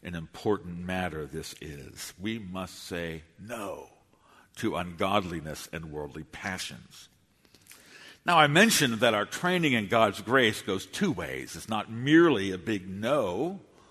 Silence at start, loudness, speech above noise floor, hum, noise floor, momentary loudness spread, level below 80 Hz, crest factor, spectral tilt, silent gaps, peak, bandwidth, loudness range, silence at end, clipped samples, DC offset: 0.05 s; -28 LUFS; 34 dB; none; -62 dBFS; 18 LU; -58 dBFS; 24 dB; -4 dB/octave; none; -6 dBFS; 13.5 kHz; 13 LU; 0.3 s; under 0.1%; under 0.1%